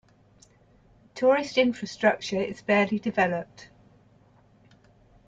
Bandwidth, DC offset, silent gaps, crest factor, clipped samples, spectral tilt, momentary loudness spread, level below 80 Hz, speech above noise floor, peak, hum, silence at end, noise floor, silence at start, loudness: 7.8 kHz; under 0.1%; none; 20 dB; under 0.1%; -5 dB/octave; 9 LU; -64 dBFS; 34 dB; -8 dBFS; none; 1.6 s; -59 dBFS; 1.15 s; -25 LUFS